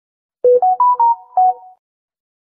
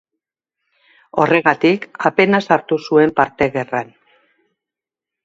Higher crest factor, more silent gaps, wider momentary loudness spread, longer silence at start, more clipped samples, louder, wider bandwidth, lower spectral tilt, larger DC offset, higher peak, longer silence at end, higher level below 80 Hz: second, 12 dB vs 18 dB; neither; second, 5 LU vs 10 LU; second, 0.45 s vs 1.15 s; neither; about the same, -14 LUFS vs -16 LUFS; second, 2 kHz vs 7.8 kHz; first, -9 dB/octave vs -6.5 dB/octave; neither; second, -4 dBFS vs 0 dBFS; second, 1.05 s vs 1.4 s; second, -68 dBFS vs -56 dBFS